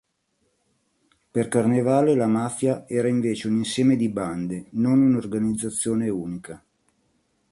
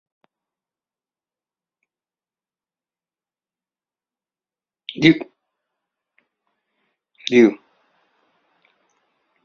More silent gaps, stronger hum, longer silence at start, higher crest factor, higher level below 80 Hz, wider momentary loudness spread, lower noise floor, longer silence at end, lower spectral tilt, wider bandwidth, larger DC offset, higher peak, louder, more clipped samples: neither; neither; second, 1.35 s vs 4.9 s; second, 18 dB vs 26 dB; first, -60 dBFS vs -66 dBFS; second, 11 LU vs 23 LU; second, -71 dBFS vs under -90 dBFS; second, 0.95 s vs 1.9 s; first, -6 dB/octave vs -4.5 dB/octave; first, 11.5 kHz vs 7 kHz; neither; second, -6 dBFS vs 0 dBFS; second, -23 LUFS vs -17 LUFS; neither